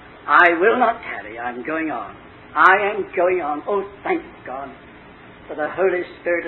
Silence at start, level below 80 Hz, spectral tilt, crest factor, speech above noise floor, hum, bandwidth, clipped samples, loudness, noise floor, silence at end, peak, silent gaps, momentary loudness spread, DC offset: 0 s; -56 dBFS; -6.5 dB/octave; 20 dB; 23 dB; none; 8 kHz; under 0.1%; -19 LUFS; -43 dBFS; 0 s; 0 dBFS; none; 18 LU; under 0.1%